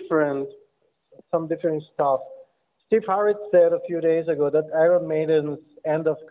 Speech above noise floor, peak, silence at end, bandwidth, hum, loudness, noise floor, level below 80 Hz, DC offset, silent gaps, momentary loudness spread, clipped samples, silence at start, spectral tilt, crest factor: 44 dB; -8 dBFS; 0.05 s; 4 kHz; none; -23 LUFS; -66 dBFS; -68 dBFS; under 0.1%; none; 9 LU; under 0.1%; 0 s; -11 dB/octave; 14 dB